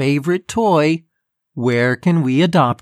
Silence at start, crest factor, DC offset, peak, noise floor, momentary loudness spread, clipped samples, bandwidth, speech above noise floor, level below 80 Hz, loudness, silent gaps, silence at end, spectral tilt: 0 s; 14 dB; under 0.1%; -2 dBFS; -70 dBFS; 7 LU; under 0.1%; 13.5 kHz; 54 dB; -56 dBFS; -16 LUFS; none; 0.05 s; -6.5 dB/octave